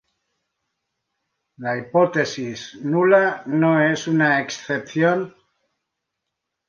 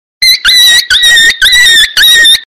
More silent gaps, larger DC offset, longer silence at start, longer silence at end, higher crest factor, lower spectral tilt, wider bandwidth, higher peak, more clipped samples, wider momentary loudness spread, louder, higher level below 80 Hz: neither; neither; first, 1.6 s vs 0.2 s; first, 1.4 s vs 0.05 s; first, 18 dB vs 4 dB; first, -6 dB/octave vs 3 dB/octave; second, 7.4 kHz vs 16.5 kHz; second, -4 dBFS vs 0 dBFS; second, under 0.1% vs 0.7%; first, 13 LU vs 2 LU; second, -20 LUFS vs -2 LUFS; second, -68 dBFS vs -34 dBFS